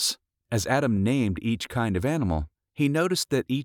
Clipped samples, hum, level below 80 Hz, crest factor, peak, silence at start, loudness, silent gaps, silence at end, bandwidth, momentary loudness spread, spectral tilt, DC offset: under 0.1%; none; -46 dBFS; 16 dB; -10 dBFS; 0 s; -26 LUFS; none; 0 s; 19 kHz; 7 LU; -5 dB/octave; under 0.1%